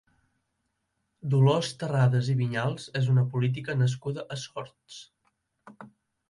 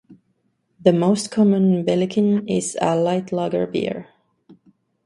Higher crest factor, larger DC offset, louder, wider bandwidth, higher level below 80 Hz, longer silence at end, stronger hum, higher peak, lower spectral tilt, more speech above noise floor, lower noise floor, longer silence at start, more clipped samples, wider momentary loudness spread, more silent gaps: about the same, 18 dB vs 20 dB; neither; second, -27 LUFS vs -20 LUFS; about the same, 11 kHz vs 11.5 kHz; about the same, -66 dBFS vs -62 dBFS; about the same, 0.45 s vs 0.5 s; neither; second, -10 dBFS vs 0 dBFS; about the same, -6.5 dB/octave vs -6.5 dB/octave; about the same, 52 dB vs 49 dB; first, -78 dBFS vs -68 dBFS; first, 1.25 s vs 0.1 s; neither; first, 17 LU vs 7 LU; neither